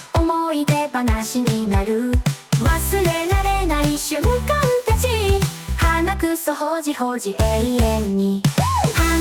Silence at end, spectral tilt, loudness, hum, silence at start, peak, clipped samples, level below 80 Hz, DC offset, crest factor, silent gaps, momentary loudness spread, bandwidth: 0 s; -5.5 dB/octave; -19 LUFS; none; 0 s; -6 dBFS; under 0.1%; -26 dBFS; under 0.1%; 12 dB; none; 3 LU; 19.5 kHz